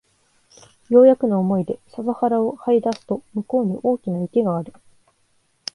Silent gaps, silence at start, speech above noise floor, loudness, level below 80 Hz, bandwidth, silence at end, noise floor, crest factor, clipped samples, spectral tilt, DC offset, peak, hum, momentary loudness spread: none; 0.9 s; 45 dB; -20 LUFS; -64 dBFS; 11 kHz; 1.05 s; -64 dBFS; 18 dB; under 0.1%; -8 dB/octave; under 0.1%; -4 dBFS; none; 14 LU